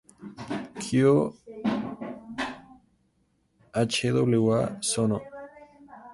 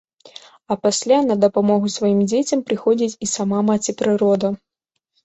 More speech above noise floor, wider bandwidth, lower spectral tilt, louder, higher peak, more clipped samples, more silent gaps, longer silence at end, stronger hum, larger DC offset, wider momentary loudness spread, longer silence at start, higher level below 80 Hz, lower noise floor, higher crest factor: second, 46 dB vs 55 dB; first, 11.5 kHz vs 8.2 kHz; about the same, -5.5 dB/octave vs -5 dB/octave; second, -27 LUFS vs -18 LUFS; second, -10 dBFS vs -4 dBFS; neither; neither; second, 0 s vs 0.7 s; neither; neither; first, 21 LU vs 5 LU; second, 0.2 s vs 0.7 s; about the same, -60 dBFS vs -60 dBFS; about the same, -70 dBFS vs -73 dBFS; about the same, 18 dB vs 16 dB